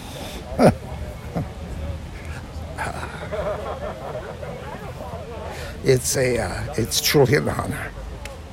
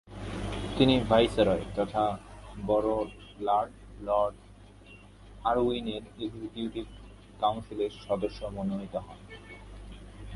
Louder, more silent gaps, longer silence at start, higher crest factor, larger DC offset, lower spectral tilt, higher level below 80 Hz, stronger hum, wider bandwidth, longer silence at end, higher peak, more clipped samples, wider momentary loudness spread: first, -24 LUFS vs -30 LUFS; neither; about the same, 0 s vs 0.05 s; about the same, 20 dB vs 22 dB; neither; second, -4.5 dB/octave vs -6.5 dB/octave; first, -38 dBFS vs -48 dBFS; second, none vs 50 Hz at -50 dBFS; first, 17 kHz vs 11.5 kHz; about the same, 0 s vs 0 s; first, -4 dBFS vs -8 dBFS; neither; second, 16 LU vs 22 LU